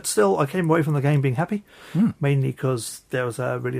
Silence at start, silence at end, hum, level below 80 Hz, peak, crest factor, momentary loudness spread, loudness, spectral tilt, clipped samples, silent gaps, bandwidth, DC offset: 0.05 s; 0 s; none; -60 dBFS; -8 dBFS; 16 dB; 8 LU; -23 LUFS; -6 dB/octave; under 0.1%; none; 16 kHz; under 0.1%